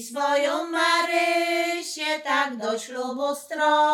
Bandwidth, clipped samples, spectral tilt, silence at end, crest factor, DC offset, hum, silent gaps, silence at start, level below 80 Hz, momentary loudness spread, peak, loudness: 17.5 kHz; under 0.1%; -1 dB/octave; 0 s; 16 dB; under 0.1%; none; none; 0 s; -86 dBFS; 8 LU; -8 dBFS; -24 LUFS